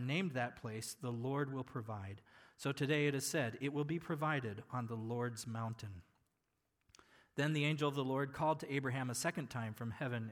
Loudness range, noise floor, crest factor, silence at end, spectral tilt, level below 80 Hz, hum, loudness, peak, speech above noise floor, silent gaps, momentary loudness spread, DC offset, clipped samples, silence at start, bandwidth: 4 LU; -85 dBFS; 18 dB; 0 s; -5 dB/octave; -76 dBFS; none; -40 LUFS; -22 dBFS; 45 dB; none; 10 LU; under 0.1%; under 0.1%; 0 s; 19 kHz